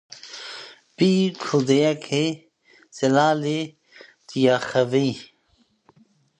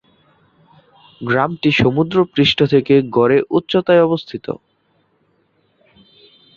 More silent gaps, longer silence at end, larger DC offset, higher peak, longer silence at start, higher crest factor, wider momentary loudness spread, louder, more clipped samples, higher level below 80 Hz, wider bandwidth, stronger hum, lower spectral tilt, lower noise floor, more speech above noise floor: neither; second, 1.15 s vs 2.05 s; neither; about the same, -4 dBFS vs -2 dBFS; second, 0.25 s vs 1.2 s; about the same, 18 dB vs 16 dB; first, 18 LU vs 14 LU; second, -21 LUFS vs -15 LUFS; neither; second, -70 dBFS vs -50 dBFS; first, 10 kHz vs 7.4 kHz; neither; second, -5.5 dB/octave vs -7 dB/octave; about the same, -64 dBFS vs -61 dBFS; about the same, 44 dB vs 47 dB